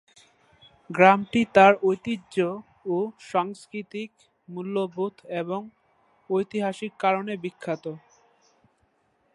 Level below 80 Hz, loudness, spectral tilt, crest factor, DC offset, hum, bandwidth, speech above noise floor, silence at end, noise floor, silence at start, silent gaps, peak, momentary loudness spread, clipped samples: -68 dBFS; -24 LUFS; -6 dB/octave; 24 dB; under 0.1%; none; 11.5 kHz; 44 dB; 1.35 s; -68 dBFS; 0.9 s; none; -2 dBFS; 19 LU; under 0.1%